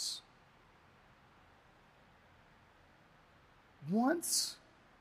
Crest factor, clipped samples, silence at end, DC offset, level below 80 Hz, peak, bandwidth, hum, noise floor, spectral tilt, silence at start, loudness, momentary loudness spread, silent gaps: 22 dB; under 0.1%; 0.45 s; under 0.1%; -76 dBFS; -20 dBFS; 15.5 kHz; none; -65 dBFS; -2.5 dB/octave; 0 s; -35 LUFS; 19 LU; none